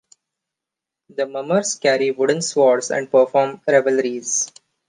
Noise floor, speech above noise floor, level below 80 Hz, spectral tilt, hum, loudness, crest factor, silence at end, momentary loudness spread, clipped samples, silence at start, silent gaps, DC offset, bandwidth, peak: -85 dBFS; 67 dB; -74 dBFS; -3 dB/octave; none; -19 LUFS; 16 dB; 0.4 s; 9 LU; under 0.1%; 1.2 s; none; under 0.1%; 10 kHz; -4 dBFS